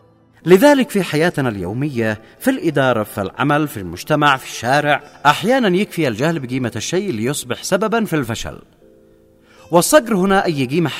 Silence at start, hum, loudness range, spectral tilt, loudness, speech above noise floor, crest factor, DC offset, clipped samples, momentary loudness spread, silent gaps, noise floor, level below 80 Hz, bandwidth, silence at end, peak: 0.45 s; none; 4 LU; -5 dB/octave; -17 LUFS; 33 dB; 16 dB; under 0.1%; under 0.1%; 10 LU; none; -50 dBFS; -48 dBFS; 16 kHz; 0 s; 0 dBFS